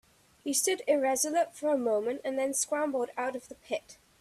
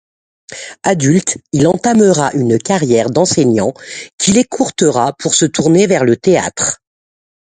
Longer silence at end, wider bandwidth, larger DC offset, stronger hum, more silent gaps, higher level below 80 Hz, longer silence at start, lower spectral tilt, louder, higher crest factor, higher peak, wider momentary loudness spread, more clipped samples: second, 0.25 s vs 0.8 s; first, 15.5 kHz vs 9.6 kHz; neither; neither; second, none vs 4.13-4.18 s; second, -74 dBFS vs -48 dBFS; about the same, 0.45 s vs 0.5 s; second, -1.5 dB/octave vs -4.5 dB/octave; second, -30 LUFS vs -12 LUFS; about the same, 16 dB vs 14 dB; second, -14 dBFS vs 0 dBFS; about the same, 10 LU vs 9 LU; neither